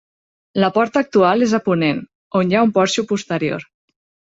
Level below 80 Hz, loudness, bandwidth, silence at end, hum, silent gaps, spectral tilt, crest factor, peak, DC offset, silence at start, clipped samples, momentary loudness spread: -60 dBFS; -17 LUFS; 8 kHz; 0.7 s; none; 2.15-2.31 s; -5.5 dB/octave; 16 dB; -2 dBFS; under 0.1%; 0.55 s; under 0.1%; 9 LU